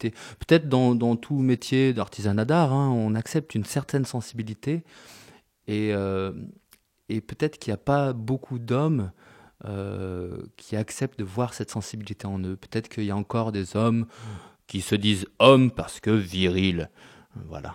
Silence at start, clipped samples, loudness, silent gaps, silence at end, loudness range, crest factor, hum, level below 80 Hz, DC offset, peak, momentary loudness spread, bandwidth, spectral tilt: 0 s; under 0.1%; -25 LUFS; none; 0 s; 8 LU; 24 dB; none; -54 dBFS; under 0.1%; 0 dBFS; 15 LU; 16 kHz; -6.5 dB/octave